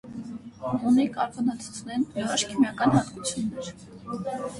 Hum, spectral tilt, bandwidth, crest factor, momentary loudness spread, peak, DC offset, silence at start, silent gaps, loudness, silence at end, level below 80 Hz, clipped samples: none; -4.5 dB/octave; 11.5 kHz; 20 dB; 16 LU; -8 dBFS; under 0.1%; 0.05 s; none; -26 LUFS; 0 s; -58 dBFS; under 0.1%